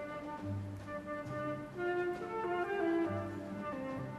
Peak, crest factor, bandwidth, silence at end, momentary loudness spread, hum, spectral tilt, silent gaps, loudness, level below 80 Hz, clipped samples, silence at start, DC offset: -24 dBFS; 14 dB; 12.5 kHz; 0 s; 9 LU; none; -7.5 dB/octave; none; -39 LUFS; -66 dBFS; under 0.1%; 0 s; under 0.1%